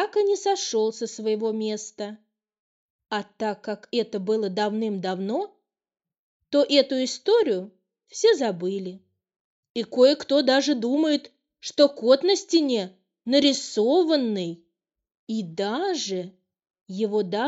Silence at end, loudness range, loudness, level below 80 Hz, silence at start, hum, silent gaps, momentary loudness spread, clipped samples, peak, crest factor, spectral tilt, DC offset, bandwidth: 0 s; 7 LU; -24 LUFS; -76 dBFS; 0 s; none; 2.59-2.99 s, 6.19-6.40 s, 9.40-9.63 s, 9.70-9.75 s, 15.19-15.27 s, 16.81-16.86 s; 14 LU; under 0.1%; -6 dBFS; 20 dB; -4 dB/octave; under 0.1%; 8.2 kHz